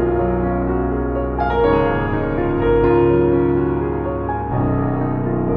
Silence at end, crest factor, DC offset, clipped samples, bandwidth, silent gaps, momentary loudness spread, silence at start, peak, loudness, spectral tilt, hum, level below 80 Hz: 0 s; 14 dB; under 0.1%; under 0.1%; 4.9 kHz; none; 7 LU; 0 s; -2 dBFS; -18 LUFS; -11 dB/octave; none; -28 dBFS